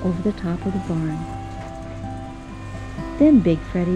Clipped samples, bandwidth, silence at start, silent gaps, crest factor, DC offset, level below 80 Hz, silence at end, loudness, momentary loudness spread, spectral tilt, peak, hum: under 0.1%; 9.8 kHz; 0 s; none; 16 dB; under 0.1%; -38 dBFS; 0 s; -21 LUFS; 19 LU; -8.5 dB/octave; -6 dBFS; none